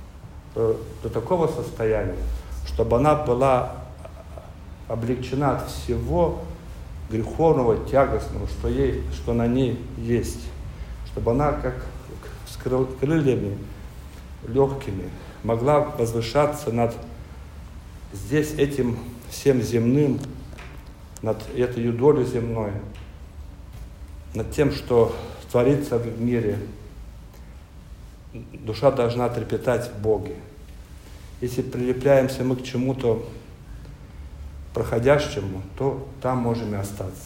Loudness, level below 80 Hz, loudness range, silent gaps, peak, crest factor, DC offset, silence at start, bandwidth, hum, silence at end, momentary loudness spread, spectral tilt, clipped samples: -24 LUFS; -38 dBFS; 3 LU; none; -4 dBFS; 20 dB; under 0.1%; 0 s; 16 kHz; none; 0 s; 22 LU; -7 dB/octave; under 0.1%